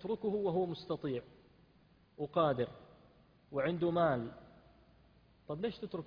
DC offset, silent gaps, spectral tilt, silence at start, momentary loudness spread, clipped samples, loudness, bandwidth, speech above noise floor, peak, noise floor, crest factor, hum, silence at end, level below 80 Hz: under 0.1%; none; -6 dB/octave; 0 s; 13 LU; under 0.1%; -36 LUFS; 5.2 kHz; 31 dB; -18 dBFS; -67 dBFS; 20 dB; none; 0 s; -68 dBFS